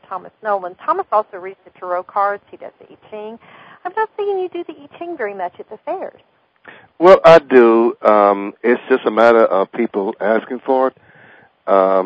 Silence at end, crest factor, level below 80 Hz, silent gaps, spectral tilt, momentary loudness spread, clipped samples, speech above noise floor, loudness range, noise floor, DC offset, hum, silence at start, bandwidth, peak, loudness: 0 s; 16 dB; -58 dBFS; none; -6.5 dB/octave; 22 LU; 0.4%; 31 dB; 13 LU; -47 dBFS; under 0.1%; none; 0.1 s; 8 kHz; 0 dBFS; -15 LUFS